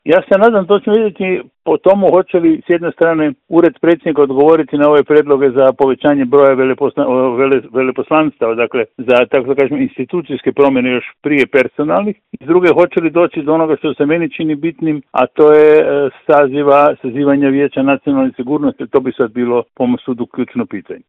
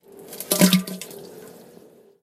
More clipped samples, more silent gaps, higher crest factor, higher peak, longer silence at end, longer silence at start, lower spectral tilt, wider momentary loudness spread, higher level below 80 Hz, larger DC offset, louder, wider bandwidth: first, 0.1% vs under 0.1%; neither; second, 12 dB vs 22 dB; about the same, 0 dBFS vs -2 dBFS; second, 0.1 s vs 0.75 s; second, 0.05 s vs 0.2 s; first, -8.5 dB/octave vs -4 dB/octave; second, 8 LU vs 24 LU; first, -54 dBFS vs -66 dBFS; neither; first, -12 LUFS vs -20 LUFS; second, 4.1 kHz vs 16 kHz